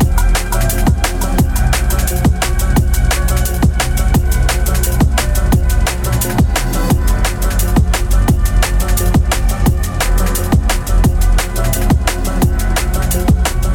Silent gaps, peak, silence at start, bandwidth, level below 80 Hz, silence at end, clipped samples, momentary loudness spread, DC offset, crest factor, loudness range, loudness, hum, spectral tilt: none; -2 dBFS; 0 s; 19 kHz; -14 dBFS; 0 s; under 0.1%; 2 LU; under 0.1%; 10 dB; 1 LU; -15 LUFS; none; -5 dB/octave